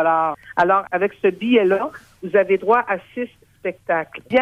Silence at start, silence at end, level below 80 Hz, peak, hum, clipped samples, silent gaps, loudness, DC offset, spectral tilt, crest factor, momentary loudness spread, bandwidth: 0 s; 0 s; -60 dBFS; -4 dBFS; none; under 0.1%; none; -19 LUFS; under 0.1%; -7 dB/octave; 16 dB; 13 LU; 8.8 kHz